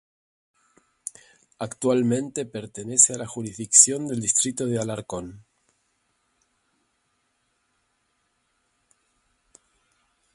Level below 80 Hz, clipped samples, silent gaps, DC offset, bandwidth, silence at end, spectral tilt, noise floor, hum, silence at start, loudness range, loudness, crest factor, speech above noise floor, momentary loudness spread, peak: -64 dBFS; under 0.1%; none; under 0.1%; 11.5 kHz; 4.95 s; -3 dB/octave; -72 dBFS; none; 1.6 s; 15 LU; -21 LUFS; 28 dB; 48 dB; 23 LU; 0 dBFS